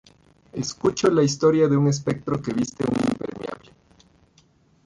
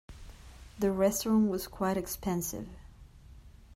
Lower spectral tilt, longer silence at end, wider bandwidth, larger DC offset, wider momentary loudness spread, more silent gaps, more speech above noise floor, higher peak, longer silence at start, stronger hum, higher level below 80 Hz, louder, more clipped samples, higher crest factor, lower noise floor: about the same, -6 dB/octave vs -5.5 dB/octave; first, 1.3 s vs 0.25 s; second, 11.5 kHz vs 16 kHz; neither; second, 15 LU vs 24 LU; neither; first, 38 dB vs 23 dB; first, -8 dBFS vs -14 dBFS; first, 0.55 s vs 0.1 s; neither; about the same, -54 dBFS vs -52 dBFS; first, -22 LUFS vs -31 LUFS; neither; about the same, 16 dB vs 18 dB; first, -59 dBFS vs -53 dBFS